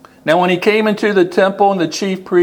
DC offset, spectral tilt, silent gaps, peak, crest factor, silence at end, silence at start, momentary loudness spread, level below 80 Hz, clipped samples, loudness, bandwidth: under 0.1%; -5.5 dB/octave; none; 0 dBFS; 14 dB; 0 s; 0.25 s; 5 LU; -62 dBFS; under 0.1%; -14 LUFS; 18 kHz